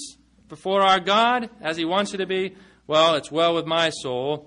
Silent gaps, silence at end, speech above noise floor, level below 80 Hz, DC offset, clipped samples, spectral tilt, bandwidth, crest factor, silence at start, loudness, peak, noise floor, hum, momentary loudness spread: none; 0.05 s; 21 dB; -62 dBFS; under 0.1%; under 0.1%; -4 dB/octave; 10.5 kHz; 16 dB; 0 s; -21 LUFS; -6 dBFS; -43 dBFS; none; 10 LU